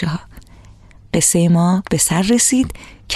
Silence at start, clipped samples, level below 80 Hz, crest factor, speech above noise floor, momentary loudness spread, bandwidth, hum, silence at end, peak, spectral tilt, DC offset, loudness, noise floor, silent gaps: 0 s; under 0.1%; -40 dBFS; 14 dB; 27 dB; 11 LU; 14.5 kHz; none; 0 s; -2 dBFS; -4.5 dB/octave; under 0.1%; -15 LUFS; -43 dBFS; none